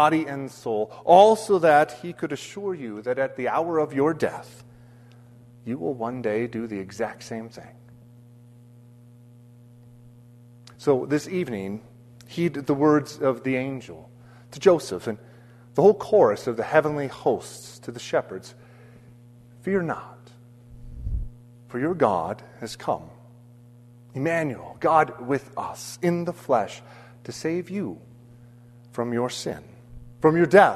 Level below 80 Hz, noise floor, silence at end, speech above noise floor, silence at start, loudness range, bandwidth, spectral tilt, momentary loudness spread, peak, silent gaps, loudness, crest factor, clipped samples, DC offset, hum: -48 dBFS; -49 dBFS; 0 s; 26 dB; 0 s; 10 LU; 13.5 kHz; -6 dB/octave; 19 LU; -2 dBFS; none; -24 LUFS; 24 dB; under 0.1%; under 0.1%; none